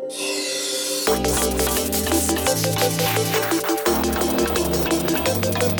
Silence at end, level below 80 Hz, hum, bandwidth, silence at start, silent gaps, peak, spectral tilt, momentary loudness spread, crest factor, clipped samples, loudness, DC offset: 0 s; -36 dBFS; none; 19.5 kHz; 0 s; none; -4 dBFS; -3.5 dB/octave; 3 LU; 16 dB; under 0.1%; -20 LUFS; under 0.1%